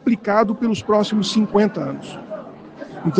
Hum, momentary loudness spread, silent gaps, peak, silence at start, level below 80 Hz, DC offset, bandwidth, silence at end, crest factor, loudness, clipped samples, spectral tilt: none; 17 LU; none; -2 dBFS; 0.05 s; -56 dBFS; under 0.1%; 9.2 kHz; 0 s; 18 dB; -19 LUFS; under 0.1%; -6 dB/octave